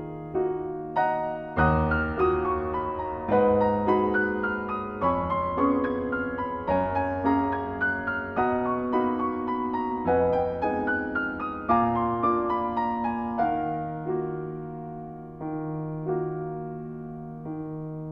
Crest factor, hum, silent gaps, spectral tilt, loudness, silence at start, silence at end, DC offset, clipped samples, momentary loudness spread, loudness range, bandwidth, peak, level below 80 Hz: 18 dB; none; none; -10 dB/octave; -27 LUFS; 0 s; 0 s; under 0.1%; under 0.1%; 12 LU; 7 LU; 5.4 kHz; -8 dBFS; -48 dBFS